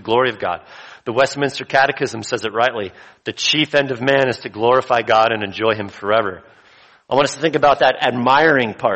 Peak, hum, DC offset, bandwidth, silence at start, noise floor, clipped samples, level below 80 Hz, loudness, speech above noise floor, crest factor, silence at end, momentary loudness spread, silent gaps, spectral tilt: -2 dBFS; none; under 0.1%; 8.8 kHz; 0.05 s; -49 dBFS; under 0.1%; -56 dBFS; -17 LUFS; 32 dB; 16 dB; 0 s; 11 LU; none; -4 dB/octave